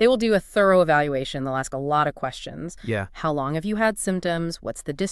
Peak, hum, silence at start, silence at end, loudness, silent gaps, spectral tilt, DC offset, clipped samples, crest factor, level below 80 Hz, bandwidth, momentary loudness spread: -6 dBFS; none; 0 s; 0 s; -23 LUFS; none; -5 dB/octave; under 0.1%; under 0.1%; 16 dB; -48 dBFS; 13.5 kHz; 13 LU